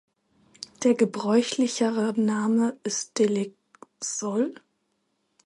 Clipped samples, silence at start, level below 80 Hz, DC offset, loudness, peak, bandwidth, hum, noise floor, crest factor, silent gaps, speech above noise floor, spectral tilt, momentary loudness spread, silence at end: under 0.1%; 0.8 s; -76 dBFS; under 0.1%; -25 LUFS; -10 dBFS; 11.5 kHz; none; -74 dBFS; 18 dB; none; 50 dB; -4.5 dB/octave; 9 LU; 0.9 s